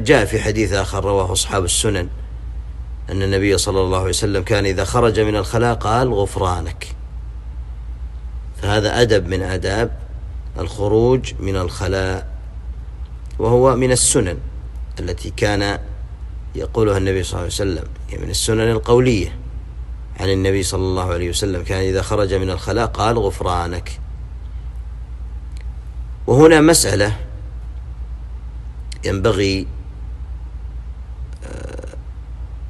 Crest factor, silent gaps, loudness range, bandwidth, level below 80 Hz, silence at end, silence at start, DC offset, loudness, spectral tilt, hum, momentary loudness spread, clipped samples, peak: 18 dB; none; 8 LU; 12.5 kHz; -28 dBFS; 0 s; 0 s; under 0.1%; -18 LUFS; -4.5 dB/octave; none; 18 LU; under 0.1%; 0 dBFS